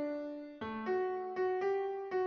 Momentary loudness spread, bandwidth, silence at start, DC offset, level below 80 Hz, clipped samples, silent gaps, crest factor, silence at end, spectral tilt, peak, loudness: 9 LU; 6.2 kHz; 0 s; under 0.1%; -74 dBFS; under 0.1%; none; 12 dB; 0 s; -7 dB/octave; -24 dBFS; -37 LUFS